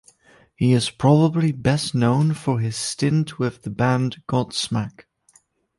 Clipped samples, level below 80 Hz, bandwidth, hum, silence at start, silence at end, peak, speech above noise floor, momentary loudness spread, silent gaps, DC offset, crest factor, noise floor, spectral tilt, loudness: under 0.1%; -52 dBFS; 11.5 kHz; none; 0.6 s; 0.75 s; -4 dBFS; 39 dB; 8 LU; none; under 0.1%; 16 dB; -59 dBFS; -6 dB/octave; -21 LUFS